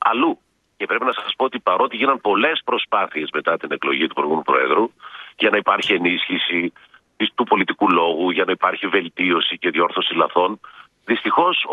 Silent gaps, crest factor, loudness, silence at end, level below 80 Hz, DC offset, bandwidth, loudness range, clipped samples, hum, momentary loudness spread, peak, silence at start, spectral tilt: none; 18 dB; -19 LUFS; 0 s; -68 dBFS; under 0.1%; 8.2 kHz; 1 LU; under 0.1%; none; 6 LU; -2 dBFS; 0 s; -5 dB/octave